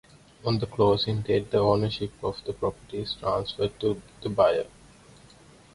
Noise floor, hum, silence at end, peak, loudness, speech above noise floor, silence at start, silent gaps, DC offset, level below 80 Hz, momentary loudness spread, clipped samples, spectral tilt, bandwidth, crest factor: -53 dBFS; none; 1.1 s; -8 dBFS; -27 LUFS; 27 dB; 0.45 s; none; under 0.1%; -52 dBFS; 10 LU; under 0.1%; -7 dB/octave; 11.5 kHz; 20 dB